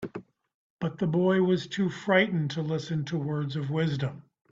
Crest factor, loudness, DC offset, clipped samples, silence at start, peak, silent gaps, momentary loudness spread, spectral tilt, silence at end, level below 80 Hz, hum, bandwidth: 20 dB; -28 LUFS; under 0.1%; under 0.1%; 0 s; -8 dBFS; 0.54-0.77 s; 11 LU; -7 dB/octave; 0.3 s; -64 dBFS; none; 7.6 kHz